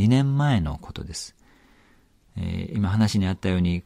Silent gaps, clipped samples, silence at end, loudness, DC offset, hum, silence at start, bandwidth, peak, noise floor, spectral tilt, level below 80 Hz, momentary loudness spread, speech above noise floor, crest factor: none; under 0.1%; 0.05 s; -24 LUFS; under 0.1%; none; 0 s; 14 kHz; -8 dBFS; -58 dBFS; -6.5 dB/octave; -42 dBFS; 15 LU; 35 dB; 16 dB